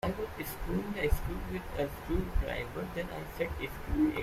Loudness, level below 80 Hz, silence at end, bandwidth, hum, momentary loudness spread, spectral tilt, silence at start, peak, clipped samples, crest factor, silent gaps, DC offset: -36 LUFS; -40 dBFS; 0 s; 16 kHz; none; 6 LU; -6.5 dB/octave; 0.05 s; -16 dBFS; under 0.1%; 18 dB; none; under 0.1%